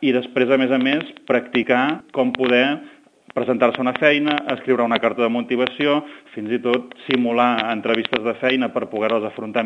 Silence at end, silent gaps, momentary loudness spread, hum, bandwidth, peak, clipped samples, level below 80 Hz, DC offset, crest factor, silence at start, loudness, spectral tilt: 0 s; none; 7 LU; none; 6.6 kHz; 0 dBFS; under 0.1%; -70 dBFS; under 0.1%; 20 dB; 0 s; -20 LUFS; -6.5 dB/octave